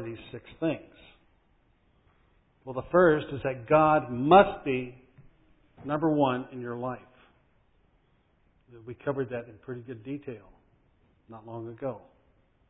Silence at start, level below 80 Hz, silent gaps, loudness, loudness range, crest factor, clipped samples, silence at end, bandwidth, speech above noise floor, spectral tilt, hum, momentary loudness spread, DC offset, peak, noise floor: 0 s; -58 dBFS; none; -27 LUFS; 14 LU; 24 dB; under 0.1%; 0.7 s; 4 kHz; 39 dB; -10.5 dB/octave; none; 22 LU; under 0.1%; -6 dBFS; -67 dBFS